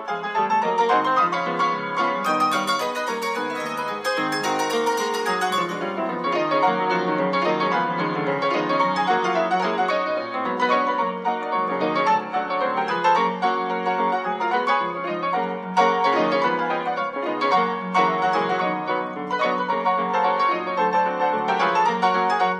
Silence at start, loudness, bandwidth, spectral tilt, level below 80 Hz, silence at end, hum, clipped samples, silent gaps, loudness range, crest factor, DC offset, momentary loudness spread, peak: 0 s; -22 LUFS; 15.5 kHz; -4.5 dB/octave; -76 dBFS; 0 s; none; under 0.1%; none; 2 LU; 16 dB; under 0.1%; 6 LU; -6 dBFS